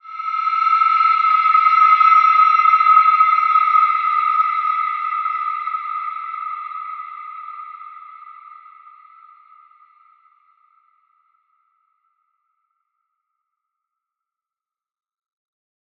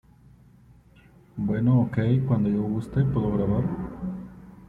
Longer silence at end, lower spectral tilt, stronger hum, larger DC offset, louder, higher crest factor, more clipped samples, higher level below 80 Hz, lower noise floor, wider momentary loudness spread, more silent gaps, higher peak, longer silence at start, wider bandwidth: first, 7.45 s vs 0.05 s; second, 4 dB/octave vs -10.5 dB/octave; neither; neither; first, -15 LUFS vs -25 LUFS; about the same, 18 dB vs 16 dB; neither; second, under -90 dBFS vs -46 dBFS; first, under -90 dBFS vs -54 dBFS; first, 21 LU vs 13 LU; neither; first, -2 dBFS vs -10 dBFS; second, 0.05 s vs 1.35 s; first, 6 kHz vs 4.2 kHz